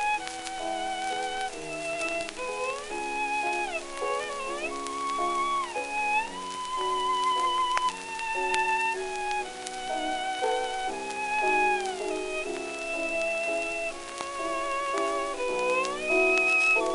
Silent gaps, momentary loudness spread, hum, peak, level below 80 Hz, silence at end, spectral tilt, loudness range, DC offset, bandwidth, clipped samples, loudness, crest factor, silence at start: none; 9 LU; none; -8 dBFS; -54 dBFS; 0 s; -1.5 dB/octave; 3 LU; under 0.1%; 11.5 kHz; under 0.1%; -28 LUFS; 22 dB; 0 s